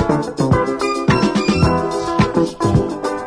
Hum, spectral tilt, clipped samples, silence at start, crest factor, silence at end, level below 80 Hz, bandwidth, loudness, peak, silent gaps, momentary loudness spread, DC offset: none; -6.5 dB/octave; under 0.1%; 0 s; 14 dB; 0 s; -32 dBFS; 10.5 kHz; -17 LUFS; -2 dBFS; none; 4 LU; under 0.1%